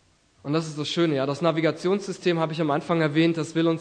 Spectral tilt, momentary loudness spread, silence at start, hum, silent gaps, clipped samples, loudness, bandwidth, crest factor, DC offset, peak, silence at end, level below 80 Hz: -6 dB/octave; 5 LU; 0.45 s; none; none; under 0.1%; -24 LUFS; 9.6 kHz; 16 dB; under 0.1%; -8 dBFS; 0 s; -68 dBFS